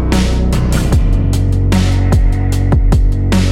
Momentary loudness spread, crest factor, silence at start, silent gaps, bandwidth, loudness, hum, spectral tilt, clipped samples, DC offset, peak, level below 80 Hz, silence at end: 2 LU; 10 dB; 0 s; none; 14 kHz; -13 LUFS; none; -6.5 dB/octave; under 0.1%; under 0.1%; 0 dBFS; -14 dBFS; 0 s